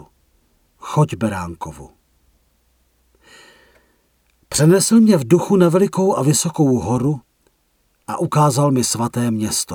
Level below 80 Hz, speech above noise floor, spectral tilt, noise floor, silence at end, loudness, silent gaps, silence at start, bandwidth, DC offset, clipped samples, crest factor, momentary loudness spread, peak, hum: -50 dBFS; 47 dB; -5.5 dB/octave; -63 dBFS; 0 s; -16 LUFS; none; 0.85 s; 18 kHz; under 0.1%; under 0.1%; 18 dB; 16 LU; -2 dBFS; none